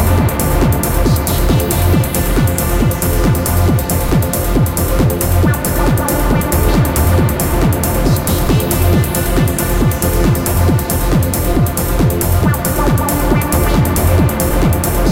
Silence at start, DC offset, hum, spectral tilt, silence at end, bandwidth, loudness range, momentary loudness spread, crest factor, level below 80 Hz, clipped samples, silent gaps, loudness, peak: 0 s; under 0.1%; none; -5.5 dB/octave; 0 s; 17.5 kHz; 1 LU; 2 LU; 12 dB; -18 dBFS; under 0.1%; none; -14 LUFS; 0 dBFS